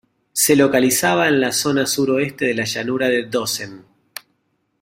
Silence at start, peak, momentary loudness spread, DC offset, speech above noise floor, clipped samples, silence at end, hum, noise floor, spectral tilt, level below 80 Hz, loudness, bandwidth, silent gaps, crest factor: 0.35 s; -2 dBFS; 20 LU; under 0.1%; 50 dB; under 0.1%; 1 s; none; -68 dBFS; -3.5 dB/octave; -58 dBFS; -17 LUFS; 16.5 kHz; none; 18 dB